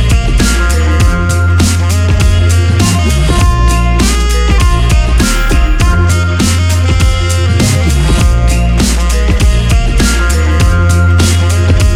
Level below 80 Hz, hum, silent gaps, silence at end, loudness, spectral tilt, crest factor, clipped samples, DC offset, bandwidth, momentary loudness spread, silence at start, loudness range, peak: -10 dBFS; none; none; 0 s; -10 LUFS; -5 dB/octave; 8 dB; under 0.1%; under 0.1%; 15.5 kHz; 2 LU; 0 s; 1 LU; 0 dBFS